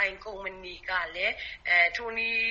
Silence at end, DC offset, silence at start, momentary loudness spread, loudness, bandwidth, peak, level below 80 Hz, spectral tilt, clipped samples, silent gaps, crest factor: 0 s; under 0.1%; 0 s; 15 LU; -27 LUFS; 7.6 kHz; -12 dBFS; -56 dBFS; 1.5 dB/octave; under 0.1%; none; 18 dB